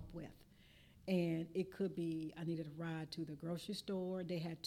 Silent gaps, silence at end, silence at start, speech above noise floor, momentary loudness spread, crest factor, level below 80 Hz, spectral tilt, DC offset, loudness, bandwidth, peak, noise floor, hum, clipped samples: none; 0 s; 0 s; 23 dB; 9 LU; 16 dB; -70 dBFS; -7 dB/octave; under 0.1%; -43 LUFS; 15.5 kHz; -28 dBFS; -66 dBFS; none; under 0.1%